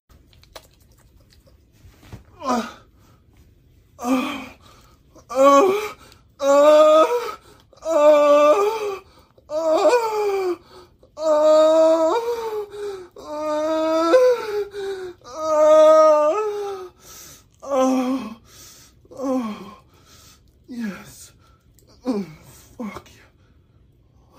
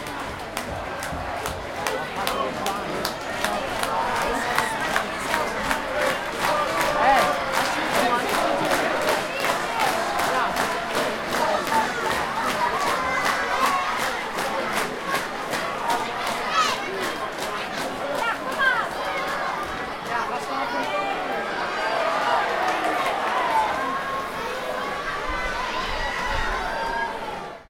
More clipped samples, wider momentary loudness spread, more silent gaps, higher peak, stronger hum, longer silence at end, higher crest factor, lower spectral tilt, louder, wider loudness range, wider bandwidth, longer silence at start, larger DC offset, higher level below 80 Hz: neither; first, 22 LU vs 6 LU; neither; about the same, -2 dBFS vs -2 dBFS; neither; first, 1.4 s vs 0.05 s; about the same, 18 dB vs 22 dB; first, -4 dB/octave vs -2.5 dB/octave; first, -18 LUFS vs -24 LUFS; first, 17 LU vs 5 LU; about the same, 16 kHz vs 17 kHz; first, 0.55 s vs 0 s; neither; second, -58 dBFS vs -44 dBFS